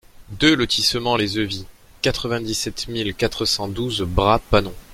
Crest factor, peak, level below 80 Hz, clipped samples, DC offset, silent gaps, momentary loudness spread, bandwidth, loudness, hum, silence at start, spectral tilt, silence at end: 20 dB; -2 dBFS; -36 dBFS; under 0.1%; under 0.1%; none; 8 LU; 16.5 kHz; -20 LUFS; none; 0.2 s; -4 dB/octave; 0 s